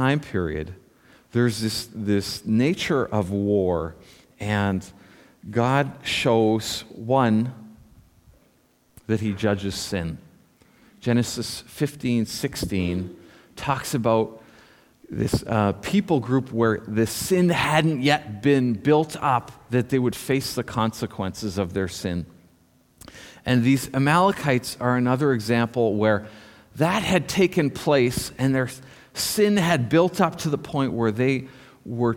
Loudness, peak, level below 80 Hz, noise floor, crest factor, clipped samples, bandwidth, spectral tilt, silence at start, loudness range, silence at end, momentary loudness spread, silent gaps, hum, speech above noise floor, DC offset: -23 LUFS; -4 dBFS; -50 dBFS; -62 dBFS; 20 dB; under 0.1%; 17.5 kHz; -5.5 dB/octave; 0 s; 6 LU; 0 s; 11 LU; none; none; 39 dB; under 0.1%